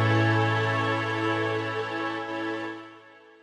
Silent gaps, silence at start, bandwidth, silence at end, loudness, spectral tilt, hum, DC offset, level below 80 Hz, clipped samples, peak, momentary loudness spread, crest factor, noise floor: none; 0 s; 9.4 kHz; 0.25 s; -27 LUFS; -6.5 dB/octave; none; under 0.1%; -70 dBFS; under 0.1%; -12 dBFS; 12 LU; 14 dB; -51 dBFS